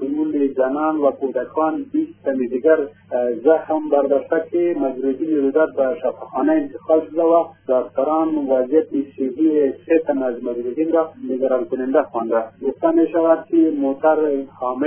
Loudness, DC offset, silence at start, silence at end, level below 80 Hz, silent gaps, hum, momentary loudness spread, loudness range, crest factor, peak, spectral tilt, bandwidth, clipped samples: -19 LUFS; under 0.1%; 0 s; 0 s; -66 dBFS; none; none; 7 LU; 1 LU; 16 dB; -2 dBFS; -10.5 dB/octave; 3.4 kHz; under 0.1%